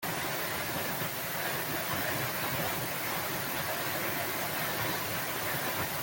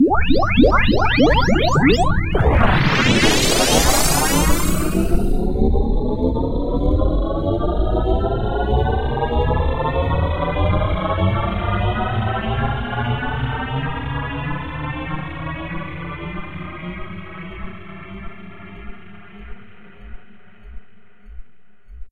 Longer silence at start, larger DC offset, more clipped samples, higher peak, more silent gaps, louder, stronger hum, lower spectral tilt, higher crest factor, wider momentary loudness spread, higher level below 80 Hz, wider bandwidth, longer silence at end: about the same, 0 s vs 0 s; second, under 0.1% vs 1%; neither; second, -18 dBFS vs -2 dBFS; neither; second, -32 LUFS vs -19 LUFS; neither; second, -3 dB/octave vs -5 dB/octave; about the same, 16 dB vs 16 dB; second, 1 LU vs 18 LU; second, -62 dBFS vs -24 dBFS; about the same, 17 kHz vs 16 kHz; about the same, 0 s vs 0 s